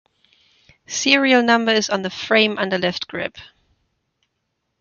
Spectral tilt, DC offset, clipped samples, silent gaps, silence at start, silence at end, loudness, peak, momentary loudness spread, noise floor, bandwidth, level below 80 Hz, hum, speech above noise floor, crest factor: -3 dB/octave; under 0.1%; under 0.1%; none; 0.9 s; 1.35 s; -18 LUFS; 0 dBFS; 13 LU; -74 dBFS; 7.4 kHz; -62 dBFS; none; 56 dB; 20 dB